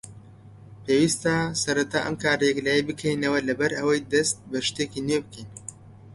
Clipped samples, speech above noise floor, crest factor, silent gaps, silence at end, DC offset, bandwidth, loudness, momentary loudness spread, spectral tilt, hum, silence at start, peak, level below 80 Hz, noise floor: under 0.1%; 23 dB; 18 dB; none; 0 s; under 0.1%; 11.5 kHz; -24 LUFS; 18 LU; -4 dB/octave; none; 0.05 s; -8 dBFS; -56 dBFS; -47 dBFS